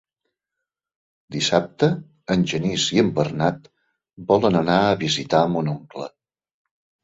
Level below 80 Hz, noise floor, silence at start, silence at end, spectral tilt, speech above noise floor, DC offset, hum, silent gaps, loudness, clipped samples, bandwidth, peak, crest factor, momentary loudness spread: -54 dBFS; -84 dBFS; 1.3 s; 0.95 s; -5 dB/octave; 64 dB; under 0.1%; none; none; -21 LUFS; under 0.1%; 8 kHz; -2 dBFS; 20 dB; 15 LU